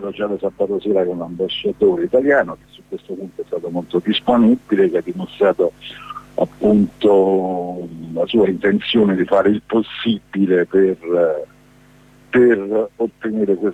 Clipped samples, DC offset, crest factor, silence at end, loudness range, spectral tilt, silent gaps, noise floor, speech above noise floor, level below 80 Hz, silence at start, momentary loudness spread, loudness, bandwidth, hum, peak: under 0.1%; under 0.1%; 14 dB; 0 s; 3 LU; -7.5 dB/octave; none; -48 dBFS; 31 dB; -54 dBFS; 0 s; 14 LU; -17 LUFS; 8.2 kHz; 50 Hz at -45 dBFS; -4 dBFS